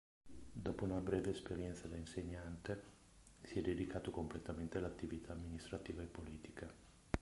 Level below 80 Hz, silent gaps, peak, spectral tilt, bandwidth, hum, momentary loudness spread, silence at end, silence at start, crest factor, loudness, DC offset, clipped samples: -58 dBFS; none; -18 dBFS; -6.5 dB/octave; 11.5 kHz; none; 15 LU; 0 s; 0.25 s; 28 dB; -46 LUFS; under 0.1%; under 0.1%